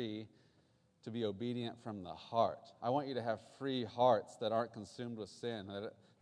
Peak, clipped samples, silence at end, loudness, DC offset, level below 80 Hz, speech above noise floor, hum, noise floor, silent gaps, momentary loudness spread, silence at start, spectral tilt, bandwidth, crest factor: -18 dBFS; under 0.1%; 0.3 s; -39 LUFS; under 0.1%; -82 dBFS; 34 dB; none; -73 dBFS; none; 14 LU; 0 s; -6.5 dB/octave; 10.5 kHz; 20 dB